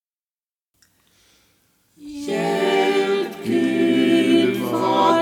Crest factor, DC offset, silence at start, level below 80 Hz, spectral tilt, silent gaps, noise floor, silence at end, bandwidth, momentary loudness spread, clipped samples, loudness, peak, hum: 18 dB; under 0.1%; 2 s; -68 dBFS; -5 dB/octave; none; under -90 dBFS; 0 s; 16.5 kHz; 8 LU; under 0.1%; -19 LUFS; -4 dBFS; none